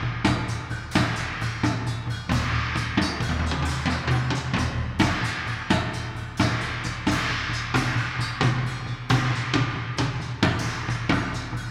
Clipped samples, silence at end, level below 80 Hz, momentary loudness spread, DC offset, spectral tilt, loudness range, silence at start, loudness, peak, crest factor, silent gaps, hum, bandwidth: under 0.1%; 0 s; -38 dBFS; 5 LU; under 0.1%; -5 dB/octave; 1 LU; 0 s; -25 LUFS; -4 dBFS; 20 dB; none; none; 13 kHz